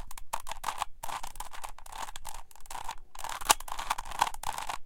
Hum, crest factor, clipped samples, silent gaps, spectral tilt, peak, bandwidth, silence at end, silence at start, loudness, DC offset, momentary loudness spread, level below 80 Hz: none; 32 dB; under 0.1%; none; 0 dB/octave; -2 dBFS; 17 kHz; 0 s; 0 s; -35 LUFS; under 0.1%; 17 LU; -46 dBFS